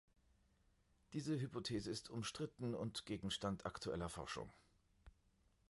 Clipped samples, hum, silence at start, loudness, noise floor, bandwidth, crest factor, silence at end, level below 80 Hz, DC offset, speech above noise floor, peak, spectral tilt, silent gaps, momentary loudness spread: under 0.1%; none; 1.1 s; -46 LUFS; -77 dBFS; 11.5 kHz; 18 dB; 0.6 s; -66 dBFS; under 0.1%; 31 dB; -30 dBFS; -5 dB/octave; none; 5 LU